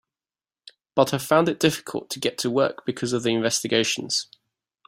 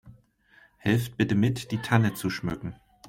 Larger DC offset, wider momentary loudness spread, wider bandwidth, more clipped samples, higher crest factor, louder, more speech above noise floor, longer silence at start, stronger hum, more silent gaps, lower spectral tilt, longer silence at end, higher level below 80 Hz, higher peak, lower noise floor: neither; about the same, 8 LU vs 9 LU; about the same, 16 kHz vs 16.5 kHz; neither; about the same, 22 dB vs 20 dB; first, -23 LUFS vs -27 LUFS; first, over 67 dB vs 34 dB; first, 0.95 s vs 0.05 s; neither; neither; second, -3.5 dB/octave vs -6.5 dB/octave; first, 0.65 s vs 0.35 s; second, -64 dBFS vs -54 dBFS; first, -4 dBFS vs -8 dBFS; first, under -90 dBFS vs -60 dBFS